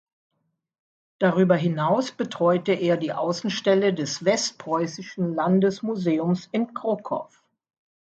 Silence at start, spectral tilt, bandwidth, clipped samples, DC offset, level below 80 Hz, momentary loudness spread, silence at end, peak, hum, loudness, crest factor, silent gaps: 1.2 s; -5.5 dB/octave; 8 kHz; under 0.1%; under 0.1%; -70 dBFS; 7 LU; 0.85 s; -6 dBFS; none; -24 LUFS; 18 dB; none